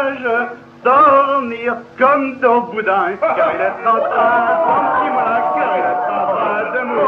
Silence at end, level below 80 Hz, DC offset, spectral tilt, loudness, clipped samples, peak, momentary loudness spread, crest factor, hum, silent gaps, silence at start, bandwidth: 0 s; -62 dBFS; under 0.1%; -7 dB/octave; -15 LUFS; under 0.1%; 0 dBFS; 7 LU; 14 dB; none; none; 0 s; 6.6 kHz